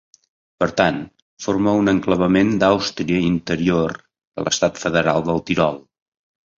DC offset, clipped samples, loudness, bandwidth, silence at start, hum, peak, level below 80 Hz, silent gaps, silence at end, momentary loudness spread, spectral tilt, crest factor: under 0.1%; under 0.1%; -19 LUFS; 7.8 kHz; 0.6 s; none; -2 dBFS; -46 dBFS; 1.22-1.37 s, 4.27-4.32 s; 0.8 s; 13 LU; -5 dB/octave; 18 dB